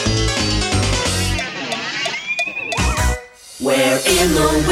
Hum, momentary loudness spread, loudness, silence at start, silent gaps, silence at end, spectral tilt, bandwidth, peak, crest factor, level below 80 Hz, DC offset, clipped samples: none; 8 LU; -17 LUFS; 0 s; none; 0 s; -3.5 dB/octave; 16.5 kHz; -2 dBFS; 16 dB; -26 dBFS; under 0.1%; under 0.1%